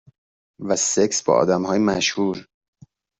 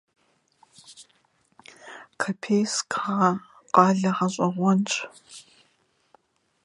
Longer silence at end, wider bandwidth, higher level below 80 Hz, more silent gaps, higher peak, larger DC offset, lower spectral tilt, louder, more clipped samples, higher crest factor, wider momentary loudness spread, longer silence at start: second, 0.75 s vs 1.25 s; second, 8.4 kHz vs 11.5 kHz; first, -58 dBFS vs -74 dBFS; neither; about the same, -4 dBFS vs -2 dBFS; neither; second, -3.5 dB/octave vs -5 dB/octave; first, -20 LUFS vs -24 LUFS; neither; second, 18 dB vs 26 dB; second, 7 LU vs 24 LU; second, 0.6 s vs 0.9 s